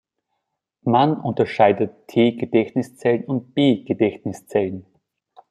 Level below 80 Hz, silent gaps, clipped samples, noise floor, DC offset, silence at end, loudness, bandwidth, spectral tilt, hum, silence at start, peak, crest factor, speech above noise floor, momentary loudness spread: -64 dBFS; none; under 0.1%; -77 dBFS; under 0.1%; 0.7 s; -20 LUFS; 13 kHz; -7.5 dB/octave; none; 0.85 s; -2 dBFS; 18 dB; 58 dB; 8 LU